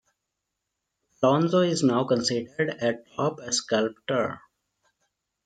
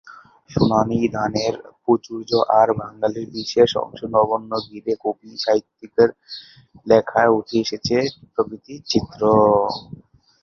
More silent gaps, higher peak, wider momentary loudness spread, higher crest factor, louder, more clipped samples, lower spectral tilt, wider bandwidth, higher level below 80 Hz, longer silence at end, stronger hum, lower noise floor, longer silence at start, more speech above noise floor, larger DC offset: neither; second, -10 dBFS vs -2 dBFS; second, 7 LU vs 11 LU; about the same, 18 dB vs 18 dB; second, -25 LUFS vs -20 LUFS; neither; second, -4.5 dB/octave vs -6 dB/octave; first, 9.4 kHz vs 7.2 kHz; second, -70 dBFS vs -50 dBFS; first, 1.1 s vs 0.45 s; neither; first, -83 dBFS vs -44 dBFS; first, 1.2 s vs 0.05 s; first, 58 dB vs 25 dB; neither